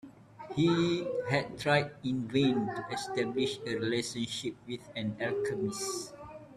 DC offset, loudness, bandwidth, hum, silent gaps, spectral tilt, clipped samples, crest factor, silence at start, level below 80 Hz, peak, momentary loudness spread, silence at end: under 0.1%; -32 LUFS; 13.5 kHz; none; none; -5 dB/octave; under 0.1%; 20 dB; 0.05 s; -66 dBFS; -12 dBFS; 11 LU; 0 s